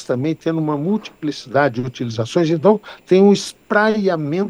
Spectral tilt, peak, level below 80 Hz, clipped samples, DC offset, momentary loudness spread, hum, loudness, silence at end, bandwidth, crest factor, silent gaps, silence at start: -6.5 dB/octave; 0 dBFS; -60 dBFS; under 0.1%; under 0.1%; 10 LU; none; -18 LUFS; 0 s; 12 kHz; 16 dB; none; 0 s